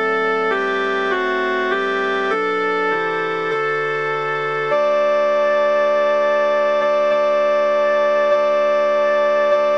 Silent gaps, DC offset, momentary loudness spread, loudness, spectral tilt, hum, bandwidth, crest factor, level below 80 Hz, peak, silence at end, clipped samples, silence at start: none; 0.4%; 4 LU; -17 LUFS; -4.5 dB/octave; none; 7.4 kHz; 12 dB; -74 dBFS; -6 dBFS; 0 s; under 0.1%; 0 s